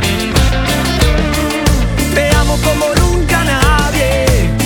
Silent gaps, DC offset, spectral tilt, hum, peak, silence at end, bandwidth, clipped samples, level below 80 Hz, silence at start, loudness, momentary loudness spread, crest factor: none; under 0.1%; -4.5 dB/octave; none; 0 dBFS; 0 s; 19 kHz; under 0.1%; -16 dBFS; 0 s; -12 LUFS; 3 LU; 12 dB